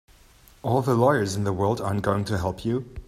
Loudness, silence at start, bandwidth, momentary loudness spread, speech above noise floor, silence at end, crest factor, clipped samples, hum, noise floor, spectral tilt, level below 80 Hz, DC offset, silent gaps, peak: -24 LUFS; 0.65 s; 15 kHz; 8 LU; 30 dB; 0.05 s; 18 dB; under 0.1%; none; -54 dBFS; -6.5 dB/octave; -48 dBFS; under 0.1%; none; -6 dBFS